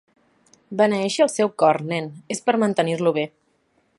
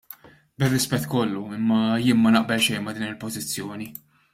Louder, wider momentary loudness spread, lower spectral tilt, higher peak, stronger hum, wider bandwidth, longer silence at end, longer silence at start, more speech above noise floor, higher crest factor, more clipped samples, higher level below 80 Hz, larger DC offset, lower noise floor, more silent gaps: about the same, -21 LUFS vs -23 LUFS; second, 10 LU vs 17 LU; about the same, -5 dB/octave vs -4.5 dB/octave; about the same, -4 dBFS vs -6 dBFS; neither; second, 11.5 kHz vs 16 kHz; first, 0.7 s vs 0.4 s; first, 0.7 s vs 0.1 s; first, 45 dB vs 24 dB; about the same, 18 dB vs 16 dB; neither; second, -70 dBFS vs -58 dBFS; neither; first, -65 dBFS vs -47 dBFS; neither